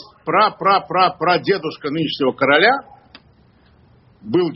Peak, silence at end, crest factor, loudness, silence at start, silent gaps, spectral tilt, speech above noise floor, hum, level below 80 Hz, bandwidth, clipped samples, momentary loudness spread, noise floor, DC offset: 0 dBFS; 0 s; 18 dB; -17 LUFS; 0 s; none; -2.5 dB/octave; 35 dB; none; -60 dBFS; 5.8 kHz; under 0.1%; 8 LU; -52 dBFS; under 0.1%